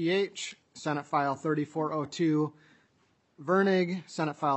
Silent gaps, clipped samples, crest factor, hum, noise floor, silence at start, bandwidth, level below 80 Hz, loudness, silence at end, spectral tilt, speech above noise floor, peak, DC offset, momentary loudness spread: none; under 0.1%; 18 dB; none; -70 dBFS; 0 s; 8.4 kHz; -82 dBFS; -30 LUFS; 0 s; -6 dB/octave; 41 dB; -12 dBFS; under 0.1%; 10 LU